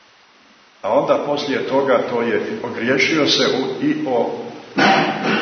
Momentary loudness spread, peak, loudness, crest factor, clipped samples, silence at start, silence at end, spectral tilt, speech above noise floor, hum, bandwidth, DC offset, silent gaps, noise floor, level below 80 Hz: 9 LU; -2 dBFS; -18 LUFS; 18 dB; under 0.1%; 0.85 s; 0 s; -4 dB/octave; 32 dB; none; 6.6 kHz; under 0.1%; none; -50 dBFS; -66 dBFS